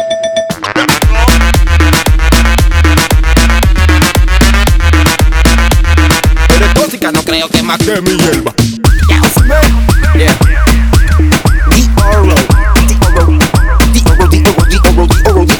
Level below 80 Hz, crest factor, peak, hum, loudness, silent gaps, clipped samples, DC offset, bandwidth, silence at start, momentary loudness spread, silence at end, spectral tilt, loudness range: -8 dBFS; 6 dB; 0 dBFS; none; -8 LUFS; none; 2%; 1%; over 20 kHz; 0 s; 3 LU; 0 s; -5 dB/octave; 1 LU